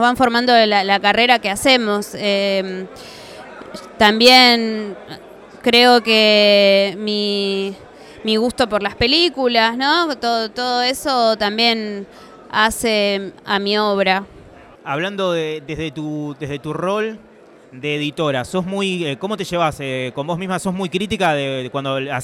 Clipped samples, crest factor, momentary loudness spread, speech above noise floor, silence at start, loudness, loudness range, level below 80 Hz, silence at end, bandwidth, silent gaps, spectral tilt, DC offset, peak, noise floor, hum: under 0.1%; 18 dB; 16 LU; 25 dB; 0 s; -16 LUFS; 9 LU; -48 dBFS; 0 s; 17 kHz; none; -4 dB/octave; under 0.1%; 0 dBFS; -42 dBFS; none